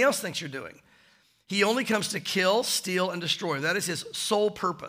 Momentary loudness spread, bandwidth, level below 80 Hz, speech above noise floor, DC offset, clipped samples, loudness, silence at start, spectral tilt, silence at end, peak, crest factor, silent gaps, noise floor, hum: 9 LU; 16 kHz; -72 dBFS; 35 dB; under 0.1%; under 0.1%; -27 LUFS; 0 s; -3 dB/octave; 0 s; -10 dBFS; 18 dB; none; -62 dBFS; none